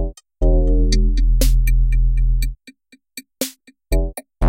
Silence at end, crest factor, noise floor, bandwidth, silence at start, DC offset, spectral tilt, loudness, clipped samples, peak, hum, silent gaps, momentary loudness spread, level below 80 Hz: 0 s; 14 dB; -48 dBFS; 16.5 kHz; 0 s; under 0.1%; -5.5 dB/octave; -20 LUFS; under 0.1%; -4 dBFS; none; none; 14 LU; -16 dBFS